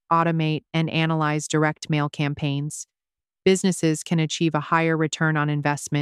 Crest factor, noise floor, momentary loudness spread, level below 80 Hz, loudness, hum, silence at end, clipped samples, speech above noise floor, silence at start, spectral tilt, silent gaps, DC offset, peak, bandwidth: 18 dB; under -90 dBFS; 6 LU; -64 dBFS; -23 LUFS; none; 0 s; under 0.1%; over 68 dB; 0.1 s; -5.5 dB/octave; none; under 0.1%; -4 dBFS; 13 kHz